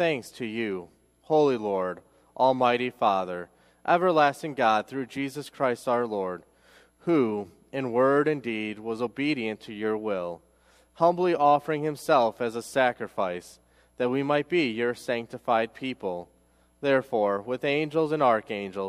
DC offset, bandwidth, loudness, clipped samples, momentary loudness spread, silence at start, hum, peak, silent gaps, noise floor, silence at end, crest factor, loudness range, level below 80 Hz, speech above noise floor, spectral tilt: under 0.1%; 15 kHz; -26 LUFS; under 0.1%; 12 LU; 0 s; none; -8 dBFS; none; -63 dBFS; 0 s; 20 dB; 3 LU; -68 dBFS; 37 dB; -6 dB/octave